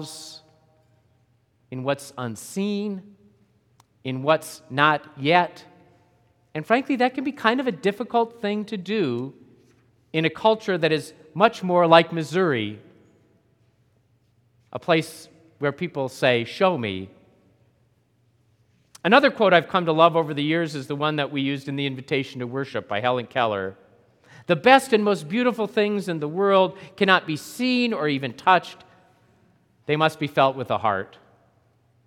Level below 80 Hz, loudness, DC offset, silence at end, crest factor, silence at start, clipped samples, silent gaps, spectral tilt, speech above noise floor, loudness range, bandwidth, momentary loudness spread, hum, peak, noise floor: -74 dBFS; -22 LUFS; under 0.1%; 1 s; 24 dB; 0 s; under 0.1%; none; -5.5 dB/octave; 42 dB; 7 LU; 16.5 kHz; 15 LU; none; 0 dBFS; -64 dBFS